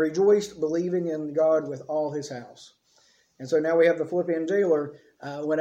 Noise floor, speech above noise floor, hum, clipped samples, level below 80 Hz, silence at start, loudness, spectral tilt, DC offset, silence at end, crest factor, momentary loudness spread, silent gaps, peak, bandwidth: -63 dBFS; 38 dB; none; under 0.1%; -72 dBFS; 0 s; -25 LUFS; -6 dB/octave; under 0.1%; 0 s; 16 dB; 16 LU; none; -10 dBFS; 9.2 kHz